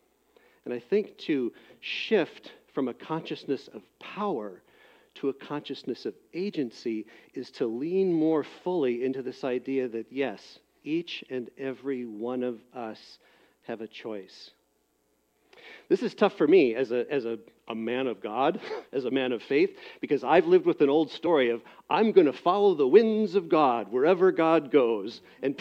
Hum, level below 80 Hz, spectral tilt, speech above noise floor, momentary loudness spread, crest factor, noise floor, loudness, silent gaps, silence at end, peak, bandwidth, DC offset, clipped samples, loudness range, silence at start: none; -78 dBFS; -7 dB/octave; 44 dB; 17 LU; 22 dB; -71 dBFS; -27 LUFS; none; 0 s; -6 dBFS; 7.2 kHz; under 0.1%; under 0.1%; 13 LU; 0.65 s